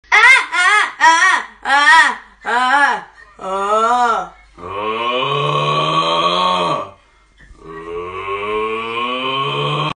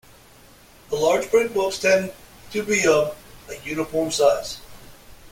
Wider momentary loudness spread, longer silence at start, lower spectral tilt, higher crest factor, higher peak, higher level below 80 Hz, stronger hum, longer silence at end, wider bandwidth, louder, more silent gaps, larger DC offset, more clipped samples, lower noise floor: about the same, 17 LU vs 16 LU; second, 0.1 s vs 0.9 s; about the same, -2.5 dB/octave vs -3.5 dB/octave; about the same, 16 dB vs 18 dB; first, 0 dBFS vs -4 dBFS; about the same, -52 dBFS vs -52 dBFS; neither; about the same, 0.05 s vs 0.05 s; second, 10.5 kHz vs 17 kHz; first, -14 LUFS vs -21 LUFS; neither; neither; neither; about the same, -49 dBFS vs -49 dBFS